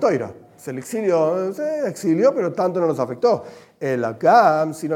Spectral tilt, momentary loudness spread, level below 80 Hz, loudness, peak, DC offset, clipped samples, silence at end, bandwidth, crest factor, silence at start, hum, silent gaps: -6.5 dB/octave; 14 LU; -72 dBFS; -20 LUFS; -2 dBFS; under 0.1%; under 0.1%; 0 s; 16.5 kHz; 18 dB; 0 s; none; none